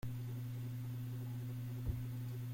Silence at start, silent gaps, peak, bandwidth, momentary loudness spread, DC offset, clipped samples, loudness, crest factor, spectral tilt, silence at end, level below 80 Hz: 0.05 s; none; -28 dBFS; 16.5 kHz; 2 LU; under 0.1%; under 0.1%; -44 LUFS; 16 dB; -7.5 dB/octave; 0 s; -56 dBFS